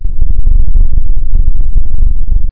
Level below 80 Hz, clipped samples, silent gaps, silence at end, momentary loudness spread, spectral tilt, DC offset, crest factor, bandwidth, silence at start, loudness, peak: -6 dBFS; under 0.1%; none; 0 s; 3 LU; -12 dB/octave; under 0.1%; 2 dB; 0.6 kHz; 0 s; -16 LUFS; 0 dBFS